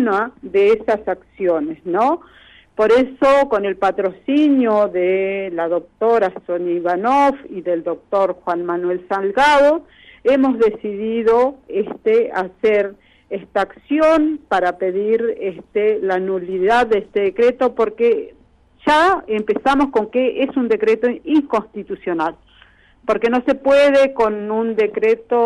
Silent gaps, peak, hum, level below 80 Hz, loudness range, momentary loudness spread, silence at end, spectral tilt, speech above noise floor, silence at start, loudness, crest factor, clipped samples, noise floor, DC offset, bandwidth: none; -4 dBFS; none; -50 dBFS; 2 LU; 8 LU; 0 s; -5.5 dB/octave; 33 dB; 0 s; -17 LUFS; 12 dB; under 0.1%; -50 dBFS; under 0.1%; 11.5 kHz